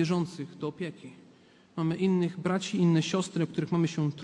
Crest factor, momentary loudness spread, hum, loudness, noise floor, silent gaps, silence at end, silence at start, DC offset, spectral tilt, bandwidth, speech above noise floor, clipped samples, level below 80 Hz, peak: 14 dB; 13 LU; none; -29 LUFS; -58 dBFS; none; 0 s; 0 s; under 0.1%; -6.5 dB/octave; 10.5 kHz; 29 dB; under 0.1%; -70 dBFS; -14 dBFS